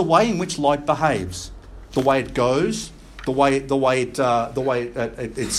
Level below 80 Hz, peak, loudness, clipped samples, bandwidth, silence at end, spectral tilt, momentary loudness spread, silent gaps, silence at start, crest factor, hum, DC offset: -44 dBFS; -2 dBFS; -21 LUFS; under 0.1%; 14 kHz; 0 s; -5 dB/octave; 11 LU; none; 0 s; 18 dB; none; under 0.1%